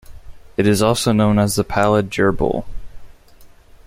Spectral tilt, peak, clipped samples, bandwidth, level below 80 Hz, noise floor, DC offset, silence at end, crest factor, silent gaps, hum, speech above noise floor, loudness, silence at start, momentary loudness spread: -5.5 dB/octave; -2 dBFS; under 0.1%; 16 kHz; -36 dBFS; -44 dBFS; under 0.1%; 0.4 s; 18 dB; none; none; 28 dB; -17 LUFS; 0.1 s; 6 LU